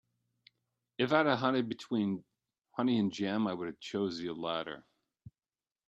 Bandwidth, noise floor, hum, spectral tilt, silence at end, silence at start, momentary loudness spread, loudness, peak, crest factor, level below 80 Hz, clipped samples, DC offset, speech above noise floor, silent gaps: 8.2 kHz; under -90 dBFS; none; -6.5 dB/octave; 0.6 s; 1 s; 13 LU; -33 LUFS; -12 dBFS; 24 dB; -76 dBFS; under 0.1%; under 0.1%; over 57 dB; none